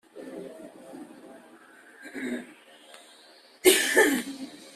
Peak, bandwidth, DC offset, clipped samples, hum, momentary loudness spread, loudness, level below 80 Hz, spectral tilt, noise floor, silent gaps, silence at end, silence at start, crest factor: -4 dBFS; 15.5 kHz; under 0.1%; under 0.1%; none; 26 LU; -24 LUFS; -70 dBFS; -1 dB/octave; -55 dBFS; none; 0.2 s; 0.15 s; 26 dB